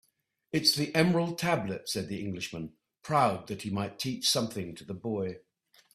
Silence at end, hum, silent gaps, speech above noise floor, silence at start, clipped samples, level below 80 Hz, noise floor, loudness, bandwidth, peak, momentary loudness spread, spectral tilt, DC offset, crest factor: 0.55 s; none; none; 43 dB; 0.55 s; under 0.1%; -66 dBFS; -73 dBFS; -30 LUFS; 15.5 kHz; -8 dBFS; 14 LU; -4 dB/octave; under 0.1%; 24 dB